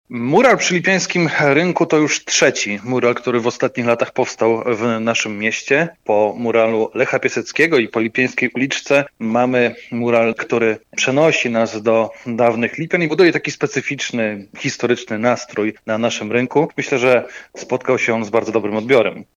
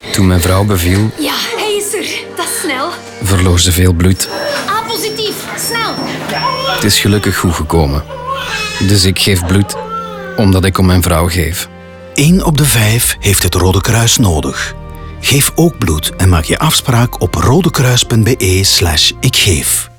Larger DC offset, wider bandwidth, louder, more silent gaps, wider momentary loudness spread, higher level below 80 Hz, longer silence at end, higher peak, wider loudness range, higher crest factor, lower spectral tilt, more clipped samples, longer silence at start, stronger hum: neither; second, 9.8 kHz vs over 20 kHz; second, -17 LUFS vs -11 LUFS; neither; second, 6 LU vs 9 LU; second, -64 dBFS vs -28 dBFS; about the same, 0.15 s vs 0.1 s; about the same, -2 dBFS vs 0 dBFS; about the same, 2 LU vs 3 LU; about the same, 14 dB vs 12 dB; about the same, -4.5 dB/octave vs -4 dB/octave; neither; about the same, 0.1 s vs 0.05 s; neither